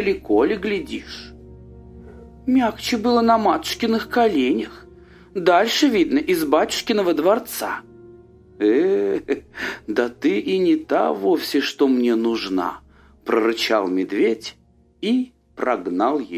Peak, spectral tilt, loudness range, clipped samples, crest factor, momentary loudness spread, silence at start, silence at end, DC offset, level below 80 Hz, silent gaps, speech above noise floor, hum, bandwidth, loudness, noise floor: -2 dBFS; -4.5 dB/octave; 3 LU; under 0.1%; 18 dB; 12 LU; 0 s; 0 s; under 0.1%; -50 dBFS; none; 27 dB; none; 16 kHz; -20 LUFS; -46 dBFS